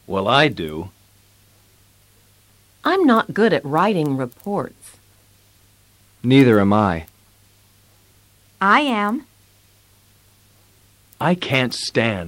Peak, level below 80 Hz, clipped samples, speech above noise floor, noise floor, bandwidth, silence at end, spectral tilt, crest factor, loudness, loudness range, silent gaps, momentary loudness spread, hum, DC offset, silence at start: -2 dBFS; -54 dBFS; under 0.1%; 37 dB; -54 dBFS; 16.5 kHz; 0 s; -6 dB/octave; 18 dB; -18 LUFS; 4 LU; none; 14 LU; none; under 0.1%; 0.1 s